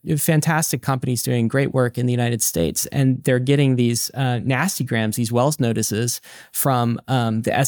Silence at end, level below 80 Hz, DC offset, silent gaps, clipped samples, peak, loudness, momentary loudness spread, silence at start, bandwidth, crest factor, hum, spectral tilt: 0 s; -52 dBFS; under 0.1%; none; under 0.1%; -6 dBFS; -20 LUFS; 4 LU; 0.05 s; over 20 kHz; 14 dB; none; -5 dB/octave